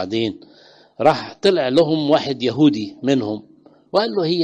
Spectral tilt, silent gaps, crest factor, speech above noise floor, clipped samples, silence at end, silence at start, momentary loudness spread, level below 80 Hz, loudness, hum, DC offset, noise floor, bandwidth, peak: -6.5 dB/octave; none; 16 dB; 31 dB; under 0.1%; 0 s; 0 s; 8 LU; -60 dBFS; -19 LUFS; none; under 0.1%; -49 dBFS; 9.2 kHz; -2 dBFS